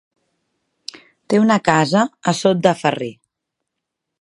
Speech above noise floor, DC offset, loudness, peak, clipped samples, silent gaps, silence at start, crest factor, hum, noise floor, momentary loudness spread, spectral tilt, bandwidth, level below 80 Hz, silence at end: 64 dB; under 0.1%; -17 LUFS; 0 dBFS; under 0.1%; none; 0.95 s; 20 dB; none; -80 dBFS; 21 LU; -5.5 dB/octave; 11.5 kHz; -62 dBFS; 1.1 s